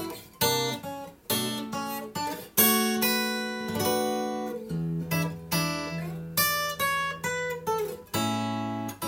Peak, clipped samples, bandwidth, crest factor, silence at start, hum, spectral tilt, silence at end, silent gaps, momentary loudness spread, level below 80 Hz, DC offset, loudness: -6 dBFS; under 0.1%; 16.5 kHz; 22 dB; 0 s; none; -3.5 dB/octave; 0 s; none; 10 LU; -62 dBFS; under 0.1%; -28 LUFS